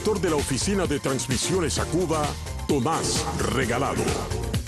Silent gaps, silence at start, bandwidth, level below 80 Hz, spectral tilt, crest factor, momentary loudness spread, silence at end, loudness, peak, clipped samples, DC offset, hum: none; 0 s; 12.5 kHz; -36 dBFS; -4.5 dB/octave; 14 dB; 3 LU; 0 s; -25 LUFS; -10 dBFS; under 0.1%; under 0.1%; none